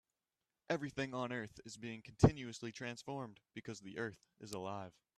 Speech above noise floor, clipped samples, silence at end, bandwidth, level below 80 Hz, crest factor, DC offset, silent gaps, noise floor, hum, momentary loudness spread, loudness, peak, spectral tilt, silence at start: over 49 dB; under 0.1%; 0.3 s; 13 kHz; -58 dBFS; 30 dB; under 0.1%; none; under -90 dBFS; none; 17 LU; -41 LUFS; -10 dBFS; -6 dB/octave; 0.7 s